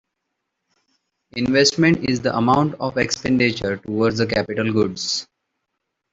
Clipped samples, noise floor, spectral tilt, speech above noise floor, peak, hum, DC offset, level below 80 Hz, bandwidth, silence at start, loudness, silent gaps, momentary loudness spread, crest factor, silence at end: under 0.1%; -78 dBFS; -4.5 dB/octave; 59 dB; -2 dBFS; none; under 0.1%; -50 dBFS; 8 kHz; 1.35 s; -19 LUFS; none; 8 LU; 18 dB; 0.9 s